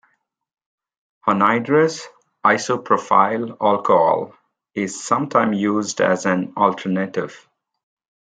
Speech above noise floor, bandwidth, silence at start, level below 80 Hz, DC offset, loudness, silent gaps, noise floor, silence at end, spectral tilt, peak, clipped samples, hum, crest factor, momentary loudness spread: 49 dB; 9.6 kHz; 1.25 s; -68 dBFS; under 0.1%; -19 LUFS; none; -68 dBFS; 0.9 s; -5 dB/octave; 0 dBFS; under 0.1%; none; 20 dB; 10 LU